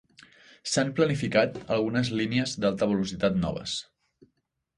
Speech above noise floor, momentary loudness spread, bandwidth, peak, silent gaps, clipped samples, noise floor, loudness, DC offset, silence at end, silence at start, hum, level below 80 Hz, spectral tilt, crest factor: 50 dB; 7 LU; 11.5 kHz; -8 dBFS; none; under 0.1%; -76 dBFS; -27 LUFS; under 0.1%; 0.95 s; 0.65 s; none; -54 dBFS; -5 dB/octave; 20 dB